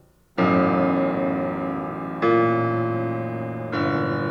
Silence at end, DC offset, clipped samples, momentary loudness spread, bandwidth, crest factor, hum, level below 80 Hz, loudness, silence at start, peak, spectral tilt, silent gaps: 0 s; under 0.1%; under 0.1%; 10 LU; 6.4 kHz; 16 dB; none; -58 dBFS; -23 LUFS; 0.35 s; -8 dBFS; -9 dB/octave; none